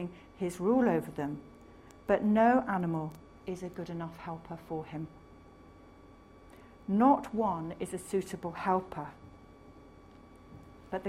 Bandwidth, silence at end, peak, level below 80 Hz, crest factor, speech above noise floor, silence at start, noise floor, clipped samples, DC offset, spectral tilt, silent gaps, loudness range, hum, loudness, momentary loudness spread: 15 kHz; 0 s; -14 dBFS; -62 dBFS; 20 dB; 24 dB; 0 s; -55 dBFS; under 0.1%; under 0.1%; -7 dB/octave; none; 12 LU; none; -32 LUFS; 19 LU